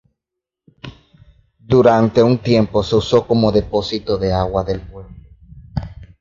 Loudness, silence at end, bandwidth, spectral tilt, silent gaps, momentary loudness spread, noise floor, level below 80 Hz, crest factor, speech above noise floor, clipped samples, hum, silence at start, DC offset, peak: -16 LUFS; 0.15 s; 7.6 kHz; -7.5 dB/octave; none; 24 LU; -83 dBFS; -36 dBFS; 18 dB; 68 dB; under 0.1%; none; 0.85 s; under 0.1%; 0 dBFS